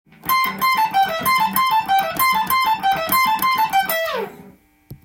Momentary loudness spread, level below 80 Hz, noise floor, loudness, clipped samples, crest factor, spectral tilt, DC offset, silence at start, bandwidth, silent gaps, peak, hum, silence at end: 4 LU; -54 dBFS; -47 dBFS; -18 LUFS; under 0.1%; 16 dB; -2 dB/octave; under 0.1%; 0.25 s; 17 kHz; none; -2 dBFS; none; 0.1 s